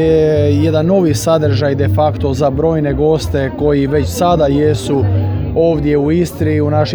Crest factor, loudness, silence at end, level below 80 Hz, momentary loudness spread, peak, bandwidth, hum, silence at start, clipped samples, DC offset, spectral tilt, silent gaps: 12 dB; -13 LUFS; 0 s; -30 dBFS; 3 LU; 0 dBFS; over 20 kHz; none; 0 s; under 0.1%; under 0.1%; -7 dB/octave; none